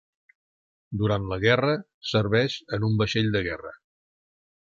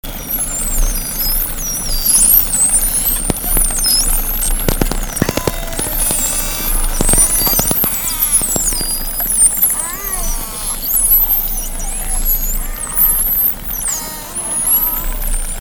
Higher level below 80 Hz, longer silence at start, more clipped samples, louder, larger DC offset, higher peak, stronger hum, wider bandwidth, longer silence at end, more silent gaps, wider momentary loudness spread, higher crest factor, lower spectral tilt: second, -50 dBFS vs -22 dBFS; first, 0.9 s vs 0.05 s; neither; second, -25 LUFS vs -13 LUFS; neither; second, -6 dBFS vs 0 dBFS; neither; second, 7.4 kHz vs 19 kHz; first, 0.95 s vs 0 s; first, 1.94-2.01 s vs none; about the same, 10 LU vs 11 LU; about the same, 20 dB vs 16 dB; first, -6.5 dB/octave vs -2 dB/octave